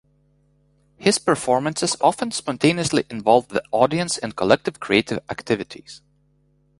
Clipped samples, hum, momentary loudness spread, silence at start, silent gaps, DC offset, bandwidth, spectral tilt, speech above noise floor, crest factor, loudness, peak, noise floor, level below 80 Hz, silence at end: under 0.1%; 50 Hz at -45 dBFS; 7 LU; 1 s; none; under 0.1%; 11.5 kHz; -4 dB/octave; 41 dB; 20 dB; -21 LUFS; -2 dBFS; -62 dBFS; -56 dBFS; 0.85 s